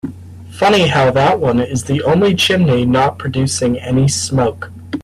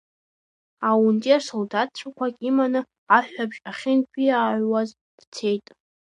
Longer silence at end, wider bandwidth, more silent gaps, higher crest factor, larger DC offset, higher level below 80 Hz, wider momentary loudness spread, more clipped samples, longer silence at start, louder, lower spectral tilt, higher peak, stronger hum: second, 0 s vs 0.55 s; first, 14 kHz vs 10 kHz; second, none vs 2.98-3.07 s, 5.01-5.18 s, 5.27-5.32 s; second, 12 dB vs 20 dB; neither; first, -42 dBFS vs -78 dBFS; second, 7 LU vs 11 LU; neither; second, 0.05 s vs 0.8 s; first, -14 LUFS vs -23 LUFS; about the same, -5 dB/octave vs -5.5 dB/octave; about the same, -2 dBFS vs -2 dBFS; neither